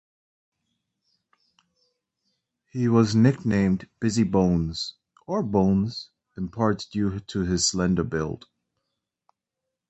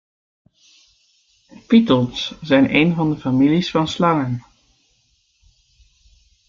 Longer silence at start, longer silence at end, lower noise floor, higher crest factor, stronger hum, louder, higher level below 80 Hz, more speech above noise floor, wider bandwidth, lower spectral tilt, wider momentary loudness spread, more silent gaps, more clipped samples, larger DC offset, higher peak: first, 2.75 s vs 1.7 s; second, 1.55 s vs 2.1 s; first, -85 dBFS vs -63 dBFS; about the same, 20 dB vs 18 dB; neither; second, -24 LUFS vs -17 LUFS; first, -46 dBFS vs -54 dBFS; first, 62 dB vs 46 dB; first, 8.2 kHz vs 7.4 kHz; about the same, -5.5 dB/octave vs -6.5 dB/octave; first, 14 LU vs 10 LU; neither; neither; neither; second, -6 dBFS vs -2 dBFS